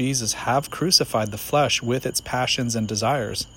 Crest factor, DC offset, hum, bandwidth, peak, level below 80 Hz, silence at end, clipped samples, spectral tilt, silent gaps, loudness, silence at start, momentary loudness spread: 22 dB; under 0.1%; none; 17 kHz; -2 dBFS; -50 dBFS; 0 s; under 0.1%; -3.5 dB/octave; none; -22 LUFS; 0 s; 7 LU